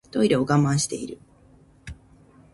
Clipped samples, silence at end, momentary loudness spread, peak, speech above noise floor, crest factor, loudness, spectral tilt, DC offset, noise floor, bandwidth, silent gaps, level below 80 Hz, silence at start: under 0.1%; 0.6 s; 24 LU; -6 dBFS; 32 dB; 18 dB; -22 LUFS; -5.5 dB/octave; under 0.1%; -54 dBFS; 11.5 kHz; none; -52 dBFS; 0.15 s